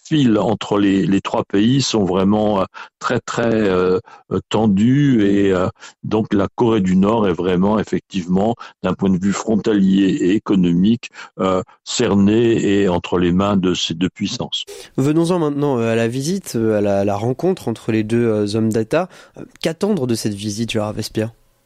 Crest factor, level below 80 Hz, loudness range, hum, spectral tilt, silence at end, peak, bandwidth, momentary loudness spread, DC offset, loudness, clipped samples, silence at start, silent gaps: 12 dB; -48 dBFS; 3 LU; none; -6 dB/octave; 0.35 s; -6 dBFS; 13.5 kHz; 8 LU; under 0.1%; -18 LUFS; under 0.1%; 0.05 s; none